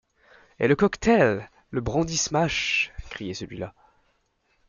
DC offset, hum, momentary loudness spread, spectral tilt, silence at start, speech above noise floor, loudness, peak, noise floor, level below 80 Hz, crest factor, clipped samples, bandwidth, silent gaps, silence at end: under 0.1%; none; 15 LU; -4.5 dB/octave; 0.6 s; 46 dB; -24 LUFS; -6 dBFS; -69 dBFS; -48 dBFS; 20 dB; under 0.1%; 9.6 kHz; none; 1 s